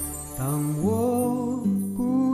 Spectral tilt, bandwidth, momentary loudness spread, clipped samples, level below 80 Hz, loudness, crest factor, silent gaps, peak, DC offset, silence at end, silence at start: -7.5 dB/octave; 14 kHz; 5 LU; under 0.1%; -48 dBFS; -25 LUFS; 12 dB; none; -12 dBFS; under 0.1%; 0 s; 0 s